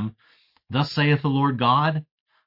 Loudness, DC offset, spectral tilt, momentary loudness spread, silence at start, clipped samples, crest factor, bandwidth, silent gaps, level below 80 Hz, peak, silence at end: -22 LUFS; under 0.1%; -7.5 dB/octave; 10 LU; 0 s; under 0.1%; 18 dB; 5.8 kHz; none; -62 dBFS; -6 dBFS; 0.45 s